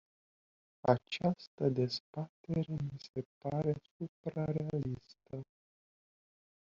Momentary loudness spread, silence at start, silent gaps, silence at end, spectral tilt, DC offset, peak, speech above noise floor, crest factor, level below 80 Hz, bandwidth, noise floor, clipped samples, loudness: 15 LU; 0.85 s; 1.47-1.58 s, 2.00-2.13 s, 2.29-2.44 s, 3.09-3.14 s, 3.25-3.41 s, 3.91-4.00 s, 4.09-4.24 s; 1.2 s; -6.5 dB/octave; under 0.1%; -12 dBFS; over 54 dB; 26 dB; -66 dBFS; 7.4 kHz; under -90 dBFS; under 0.1%; -37 LUFS